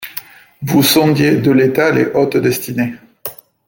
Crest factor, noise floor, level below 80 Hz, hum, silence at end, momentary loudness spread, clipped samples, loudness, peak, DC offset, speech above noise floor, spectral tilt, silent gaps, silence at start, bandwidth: 14 dB; -33 dBFS; -52 dBFS; none; 0.35 s; 17 LU; under 0.1%; -13 LUFS; 0 dBFS; under 0.1%; 20 dB; -5 dB/octave; none; 0 s; 17 kHz